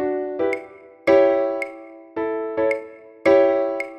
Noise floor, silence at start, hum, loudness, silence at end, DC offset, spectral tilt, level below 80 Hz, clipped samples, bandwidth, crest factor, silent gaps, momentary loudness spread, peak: -40 dBFS; 0 s; none; -21 LUFS; 0 s; under 0.1%; -6 dB/octave; -60 dBFS; under 0.1%; 9 kHz; 18 dB; none; 15 LU; -4 dBFS